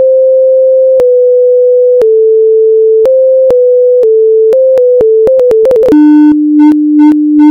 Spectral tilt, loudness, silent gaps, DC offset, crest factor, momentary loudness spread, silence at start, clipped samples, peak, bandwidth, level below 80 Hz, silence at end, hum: -8 dB/octave; -5 LUFS; none; under 0.1%; 4 dB; 1 LU; 0 s; 3%; 0 dBFS; 4.7 kHz; -46 dBFS; 0 s; none